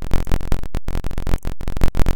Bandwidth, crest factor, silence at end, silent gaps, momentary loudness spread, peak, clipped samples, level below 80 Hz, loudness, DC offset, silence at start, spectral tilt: 16.5 kHz; 12 dB; 0 s; none; 5 LU; -2 dBFS; under 0.1%; -20 dBFS; -26 LUFS; under 0.1%; 0 s; -6.5 dB/octave